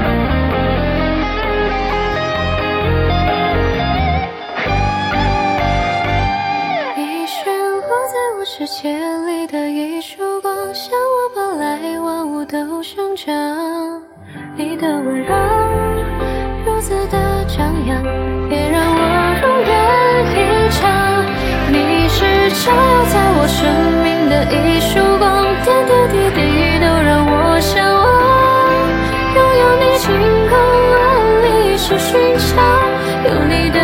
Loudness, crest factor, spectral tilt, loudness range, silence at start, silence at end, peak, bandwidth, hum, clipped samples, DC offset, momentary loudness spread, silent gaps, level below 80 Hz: -14 LUFS; 14 dB; -5.5 dB/octave; 8 LU; 0 s; 0 s; 0 dBFS; 17 kHz; none; under 0.1%; under 0.1%; 10 LU; none; -26 dBFS